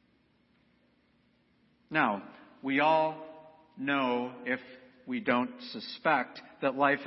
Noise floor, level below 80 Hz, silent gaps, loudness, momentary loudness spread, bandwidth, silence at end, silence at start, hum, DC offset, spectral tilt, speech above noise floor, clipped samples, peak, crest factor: -69 dBFS; -78 dBFS; none; -31 LUFS; 15 LU; 5.8 kHz; 0 s; 1.9 s; none; under 0.1%; -2.5 dB/octave; 39 dB; under 0.1%; -12 dBFS; 22 dB